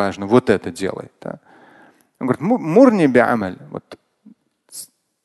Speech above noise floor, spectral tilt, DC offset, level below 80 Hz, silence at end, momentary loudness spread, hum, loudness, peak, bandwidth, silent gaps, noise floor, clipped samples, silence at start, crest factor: 34 dB; -6.5 dB/octave; under 0.1%; -54 dBFS; 0.4 s; 23 LU; none; -16 LUFS; 0 dBFS; 12.5 kHz; none; -51 dBFS; under 0.1%; 0 s; 18 dB